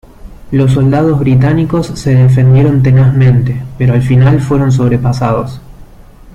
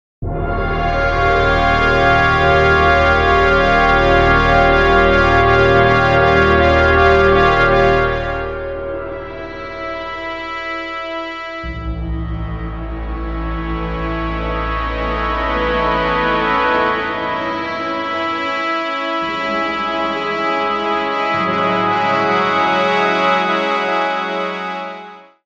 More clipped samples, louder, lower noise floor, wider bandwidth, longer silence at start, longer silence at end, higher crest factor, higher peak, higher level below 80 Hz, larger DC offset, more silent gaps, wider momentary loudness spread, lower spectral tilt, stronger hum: neither; first, -9 LUFS vs -15 LUFS; about the same, -35 dBFS vs -36 dBFS; about the same, 8.6 kHz vs 8.2 kHz; about the same, 0.25 s vs 0.2 s; second, 0.05 s vs 0.2 s; second, 8 dB vs 16 dB; about the same, -2 dBFS vs 0 dBFS; about the same, -30 dBFS vs -26 dBFS; second, under 0.1% vs 0.2%; neither; second, 7 LU vs 13 LU; first, -8.5 dB/octave vs -6.5 dB/octave; neither